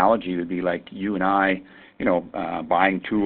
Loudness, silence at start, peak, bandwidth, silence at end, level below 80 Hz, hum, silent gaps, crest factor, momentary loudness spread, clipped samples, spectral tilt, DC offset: -23 LUFS; 0 s; -4 dBFS; 4.4 kHz; 0 s; -54 dBFS; none; none; 20 dB; 8 LU; under 0.1%; -10.5 dB/octave; under 0.1%